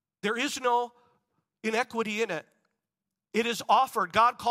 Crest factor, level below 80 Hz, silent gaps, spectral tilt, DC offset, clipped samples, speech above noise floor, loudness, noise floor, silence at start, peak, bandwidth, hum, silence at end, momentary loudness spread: 20 dB; -72 dBFS; none; -3 dB/octave; under 0.1%; under 0.1%; 62 dB; -28 LUFS; -89 dBFS; 0.25 s; -8 dBFS; 16 kHz; none; 0 s; 9 LU